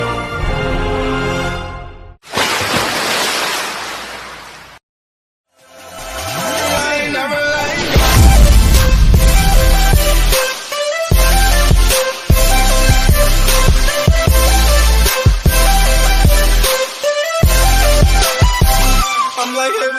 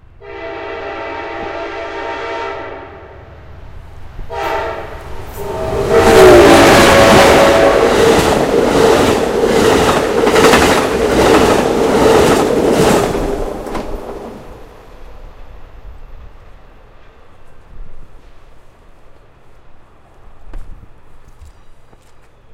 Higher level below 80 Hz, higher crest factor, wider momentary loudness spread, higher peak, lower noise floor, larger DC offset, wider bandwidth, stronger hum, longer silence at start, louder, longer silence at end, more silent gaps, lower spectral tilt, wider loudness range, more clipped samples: first, -14 dBFS vs -30 dBFS; about the same, 12 dB vs 14 dB; second, 9 LU vs 21 LU; about the same, 0 dBFS vs 0 dBFS; about the same, -38 dBFS vs -41 dBFS; neither; about the same, 15.5 kHz vs 16.5 kHz; neither; second, 0 s vs 0.2 s; second, -13 LUFS vs -10 LUFS; second, 0 s vs 0.75 s; first, 4.83-5.44 s vs none; about the same, -3.5 dB/octave vs -4.5 dB/octave; second, 8 LU vs 18 LU; second, under 0.1% vs 0.4%